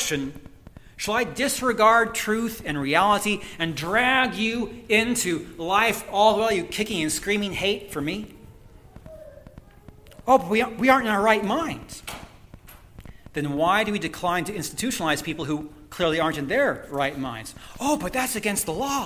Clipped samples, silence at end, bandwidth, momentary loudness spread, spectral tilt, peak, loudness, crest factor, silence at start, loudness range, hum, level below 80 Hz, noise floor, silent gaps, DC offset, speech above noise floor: under 0.1%; 0 s; 16 kHz; 13 LU; -3.5 dB/octave; -2 dBFS; -23 LUFS; 22 dB; 0 s; 5 LU; none; -50 dBFS; -48 dBFS; none; under 0.1%; 24 dB